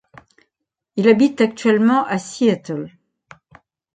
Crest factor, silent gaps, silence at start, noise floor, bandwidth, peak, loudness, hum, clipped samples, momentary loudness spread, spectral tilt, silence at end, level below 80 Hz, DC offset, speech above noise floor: 16 dB; none; 0.95 s; -79 dBFS; 9.2 kHz; -2 dBFS; -17 LUFS; none; under 0.1%; 15 LU; -6 dB/octave; 1.05 s; -64 dBFS; under 0.1%; 63 dB